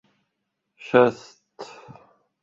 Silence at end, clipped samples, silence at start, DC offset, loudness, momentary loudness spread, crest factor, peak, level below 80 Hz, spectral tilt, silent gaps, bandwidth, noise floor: 0.8 s; under 0.1%; 0.85 s; under 0.1%; -20 LUFS; 24 LU; 24 dB; -2 dBFS; -70 dBFS; -6.5 dB/octave; none; 7.6 kHz; -79 dBFS